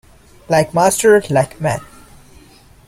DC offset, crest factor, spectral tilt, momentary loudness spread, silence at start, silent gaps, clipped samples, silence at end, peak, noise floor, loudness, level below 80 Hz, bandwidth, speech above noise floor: under 0.1%; 16 dB; -4.5 dB/octave; 10 LU; 0.5 s; none; under 0.1%; 1.05 s; 0 dBFS; -45 dBFS; -15 LUFS; -46 dBFS; 16 kHz; 31 dB